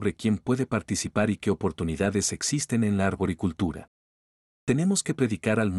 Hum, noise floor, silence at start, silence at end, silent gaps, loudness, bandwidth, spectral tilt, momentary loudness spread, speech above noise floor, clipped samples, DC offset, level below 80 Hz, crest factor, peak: none; under -90 dBFS; 0 s; 0 s; 3.88-4.67 s; -27 LUFS; 13 kHz; -5 dB/octave; 4 LU; over 64 dB; under 0.1%; under 0.1%; -54 dBFS; 18 dB; -10 dBFS